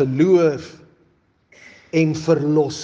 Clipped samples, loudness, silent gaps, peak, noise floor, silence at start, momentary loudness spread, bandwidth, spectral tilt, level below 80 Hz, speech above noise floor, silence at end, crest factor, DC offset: under 0.1%; -18 LUFS; none; -4 dBFS; -60 dBFS; 0 s; 12 LU; 8 kHz; -7 dB/octave; -62 dBFS; 43 dB; 0 s; 16 dB; under 0.1%